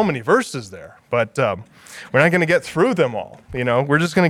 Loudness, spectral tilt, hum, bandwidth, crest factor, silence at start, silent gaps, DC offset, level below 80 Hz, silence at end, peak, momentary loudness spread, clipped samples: -19 LUFS; -6 dB/octave; none; 14.5 kHz; 20 dB; 0 s; none; under 0.1%; -54 dBFS; 0 s; 0 dBFS; 17 LU; under 0.1%